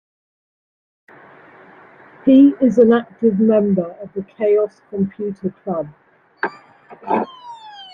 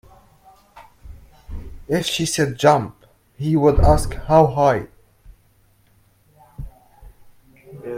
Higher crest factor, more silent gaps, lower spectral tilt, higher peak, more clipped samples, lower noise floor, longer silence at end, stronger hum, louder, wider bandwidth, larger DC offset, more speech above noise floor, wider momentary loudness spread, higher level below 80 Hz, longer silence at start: about the same, 16 dB vs 20 dB; neither; first, -9 dB/octave vs -5.5 dB/octave; about the same, -2 dBFS vs 0 dBFS; neither; second, -45 dBFS vs -57 dBFS; about the same, 0.1 s vs 0 s; neither; about the same, -17 LUFS vs -18 LUFS; second, 6.6 kHz vs 16 kHz; neither; second, 29 dB vs 41 dB; second, 18 LU vs 24 LU; second, -62 dBFS vs -30 dBFS; first, 2.25 s vs 0.75 s